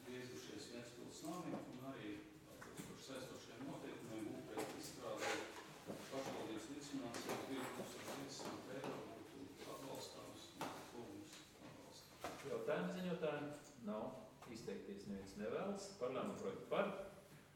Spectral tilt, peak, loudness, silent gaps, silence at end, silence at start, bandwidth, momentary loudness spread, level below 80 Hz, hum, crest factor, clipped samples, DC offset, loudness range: -4.5 dB/octave; -26 dBFS; -49 LUFS; none; 0 s; 0 s; 17 kHz; 12 LU; -78 dBFS; none; 24 dB; under 0.1%; under 0.1%; 5 LU